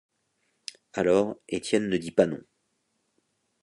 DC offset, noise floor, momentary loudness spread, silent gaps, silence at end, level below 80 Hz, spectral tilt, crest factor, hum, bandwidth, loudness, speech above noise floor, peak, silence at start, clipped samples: under 0.1%; -75 dBFS; 19 LU; none; 1.25 s; -62 dBFS; -5.5 dB/octave; 24 dB; none; 11.5 kHz; -26 LUFS; 50 dB; -4 dBFS; 0.95 s; under 0.1%